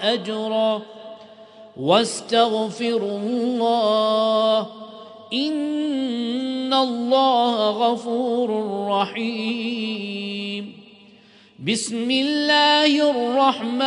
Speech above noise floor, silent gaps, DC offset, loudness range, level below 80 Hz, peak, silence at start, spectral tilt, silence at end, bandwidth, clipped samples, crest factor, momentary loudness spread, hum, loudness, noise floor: 30 dB; none; under 0.1%; 5 LU; -76 dBFS; -2 dBFS; 0 s; -4 dB/octave; 0 s; 10.5 kHz; under 0.1%; 20 dB; 11 LU; none; -21 LUFS; -50 dBFS